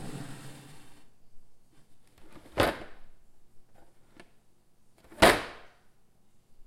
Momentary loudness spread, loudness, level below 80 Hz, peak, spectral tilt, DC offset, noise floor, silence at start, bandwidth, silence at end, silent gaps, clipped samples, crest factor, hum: 29 LU; -26 LUFS; -52 dBFS; -4 dBFS; -3.5 dB/octave; under 0.1%; -59 dBFS; 0 s; 16.5 kHz; 0.05 s; none; under 0.1%; 30 dB; none